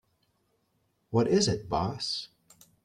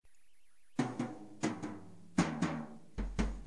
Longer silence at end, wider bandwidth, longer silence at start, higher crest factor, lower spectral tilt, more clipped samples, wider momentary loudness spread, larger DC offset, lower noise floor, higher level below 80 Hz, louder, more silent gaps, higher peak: first, 0.6 s vs 0 s; first, 14 kHz vs 11.5 kHz; first, 1.1 s vs 0 s; about the same, 20 dB vs 22 dB; about the same, -5 dB/octave vs -5.5 dB/octave; neither; about the same, 10 LU vs 11 LU; second, under 0.1% vs 0.2%; about the same, -74 dBFS vs -73 dBFS; second, -56 dBFS vs -48 dBFS; first, -29 LUFS vs -39 LUFS; neither; first, -12 dBFS vs -16 dBFS